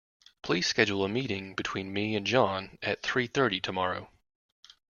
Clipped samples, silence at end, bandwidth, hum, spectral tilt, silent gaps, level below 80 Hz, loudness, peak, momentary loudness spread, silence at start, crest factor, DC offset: under 0.1%; 0.9 s; 7.2 kHz; none; -4.5 dB/octave; none; -64 dBFS; -29 LUFS; -8 dBFS; 8 LU; 0.45 s; 24 dB; under 0.1%